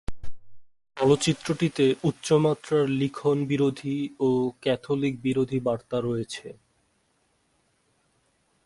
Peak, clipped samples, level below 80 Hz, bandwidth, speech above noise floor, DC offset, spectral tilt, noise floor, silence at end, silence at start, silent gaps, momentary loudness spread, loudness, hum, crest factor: -8 dBFS; under 0.1%; -54 dBFS; 11.5 kHz; 45 dB; under 0.1%; -6 dB/octave; -69 dBFS; 2.15 s; 0.1 s; none; 8 LU; -25 LUFS; none; 18 dB